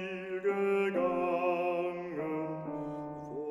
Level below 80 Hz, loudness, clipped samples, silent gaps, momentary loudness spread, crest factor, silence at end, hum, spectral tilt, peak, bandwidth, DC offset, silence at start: -70 dBFS; -33 LUFS; under 0.1%; none; 10 LU; 14 dB; 0 s; none; -7.5 dB/octave; -18 dBFS; 11.5 kHz; under 0.1%; 0 s